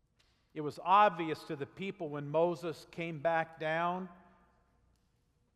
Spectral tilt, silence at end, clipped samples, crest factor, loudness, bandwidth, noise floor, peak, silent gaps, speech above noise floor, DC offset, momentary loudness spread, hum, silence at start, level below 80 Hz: -6.5 dB/octave; 1.4 s; under 0.1%; 20 dB; -34 LUFS; 13 kHz; -74 dBFS; -14 dBFS; none; 41 dB; under 0.1%; 16 LU; none; 0.55 s; -74 dBFS